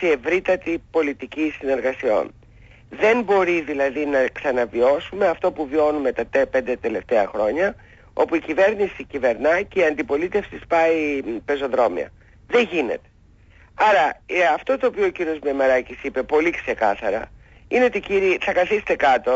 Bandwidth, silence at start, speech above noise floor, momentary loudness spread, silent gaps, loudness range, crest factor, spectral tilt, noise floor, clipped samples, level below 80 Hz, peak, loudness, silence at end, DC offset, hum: 7.8 kHz; 0 s; 31 dB; 7 LU; none; 2 LU; 14 dB; -5 dB/octave; -51 dBFS; under 0.1%; -50 dBFS; -6 dBFS; -21 LUFS; 0 s; under 0.1%; none